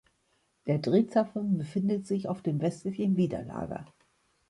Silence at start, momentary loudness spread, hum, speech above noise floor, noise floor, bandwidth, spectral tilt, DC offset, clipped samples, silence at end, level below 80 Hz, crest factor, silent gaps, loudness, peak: 0.65 s; 12 LU; none; 44 dB; -73 dBFS; 11.5 kHz; -8.5 dB/octave; under 0.1%; under 0.1%; 0.65 s; -62 dBFS; 18 dB; none; -30 LUFS; -12 dBFS